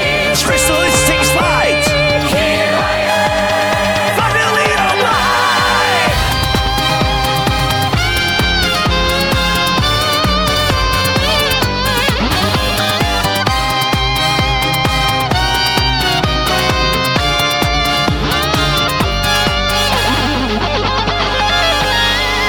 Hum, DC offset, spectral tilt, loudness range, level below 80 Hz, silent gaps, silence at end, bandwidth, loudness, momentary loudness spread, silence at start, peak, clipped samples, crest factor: none; under 0.1%; -3.5 dB/octave; 1 LU; -24 dBFS; none; 0 s; over 20 kHz; -12 LUFS; 2 LU; 0 s; 0 dBFS; under 0.1%; 14 dB